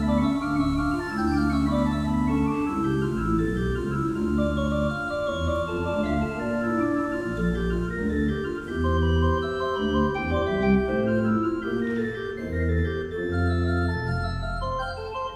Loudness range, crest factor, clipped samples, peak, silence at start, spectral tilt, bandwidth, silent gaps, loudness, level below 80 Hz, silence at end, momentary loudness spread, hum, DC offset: 2 LU; 16 dB; under 0.1%; -10 dBFS; 0 s; -7.5 dB/octave; 11.5 kHz; none; -26 LUFS; -36 dBFS; 0 s; 5 LU; none; under 0.1%